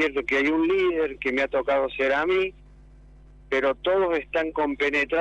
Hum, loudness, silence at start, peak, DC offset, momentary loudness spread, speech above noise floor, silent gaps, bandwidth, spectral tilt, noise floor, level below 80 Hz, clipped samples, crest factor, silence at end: none; -24 LUFS; 0 s; -12 dBFS; under 0.1%; 4 LU; 25 dB; none; 8.4 kHz; -5 dB/octave; -49 dBFS; -50 dBFS; under 0.1%; 12 dB; 0 s